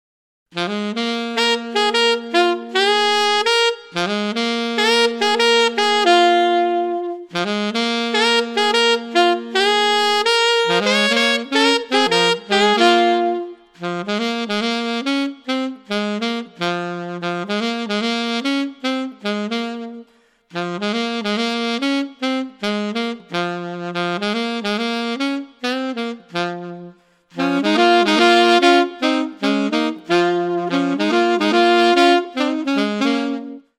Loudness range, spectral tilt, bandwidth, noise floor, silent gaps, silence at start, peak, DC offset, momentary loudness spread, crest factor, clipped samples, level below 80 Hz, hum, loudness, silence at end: 7 LU; -3.5 dB/octave; 15.5 kHz; -54 dBFS; none; 0.55 s; -2 dBFS; under 0.1%; 11 LU; 16 dB; under 0.1%; -68 dBFS; none; -18 LUFS; 0.2 s